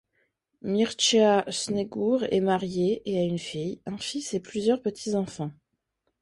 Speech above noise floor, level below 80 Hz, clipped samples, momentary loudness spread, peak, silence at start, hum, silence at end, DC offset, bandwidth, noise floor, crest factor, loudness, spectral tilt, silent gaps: 52 dB; -64 dBFS; under 0.1%; 12 LU; -10 dBFS; 0.65 s; none; 0.7 s; under 0.1%; 11.5 kHz; -78 dBFS; 18 dB; -26 LUFS; -4.5 dB/octave; none